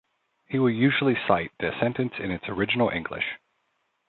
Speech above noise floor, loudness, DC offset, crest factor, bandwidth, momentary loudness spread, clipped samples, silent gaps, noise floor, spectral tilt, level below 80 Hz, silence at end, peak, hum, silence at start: 49 dB; -25 LUFS; under 0.1%; 22 dB; 4.3 kHz; 9 LU; under 0.1%; none; -74 dBFS; -10 dB/octave; -56 dBFS; 0.75 s; -6 dBFS; none; 0.5 s